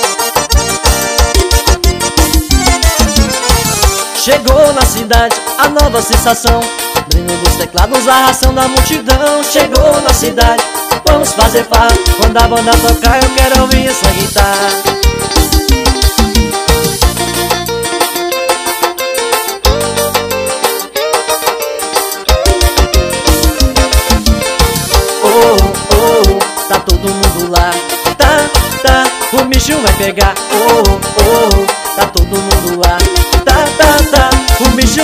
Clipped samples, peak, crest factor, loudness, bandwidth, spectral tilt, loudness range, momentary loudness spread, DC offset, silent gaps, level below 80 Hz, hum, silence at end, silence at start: 1%; 0 dBFS; 10 dB; -9 LUFS; 16.5 kHz; -3.5 dB/octave; 3 LU; 5 LU; under 0.1%; none; -14 dBFS; none; 0 s; 0 s